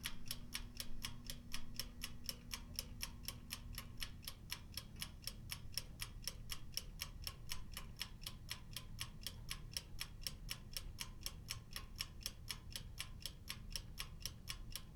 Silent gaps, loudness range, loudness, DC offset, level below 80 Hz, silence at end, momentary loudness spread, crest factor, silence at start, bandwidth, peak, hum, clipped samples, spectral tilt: none; 1 LU; -49 LUFS; under 0.1%; -54 dBFS; 0 s; 4 LU; 26 dB; 0 s; over 20 kHz; -24 dBFS; none; under 0.1%; -2 dB/octave